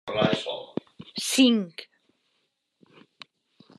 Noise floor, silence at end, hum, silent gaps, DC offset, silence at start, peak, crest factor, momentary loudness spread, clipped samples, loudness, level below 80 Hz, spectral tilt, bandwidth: -75 dBFS; 1.95 s; none; none; under 0.1%; 0.05 s; -8 dBFS; 20 dB; 18 LU; under 0.1%; -25 LUFS; -70 dBFS; -4 dB/octave; 13 kHz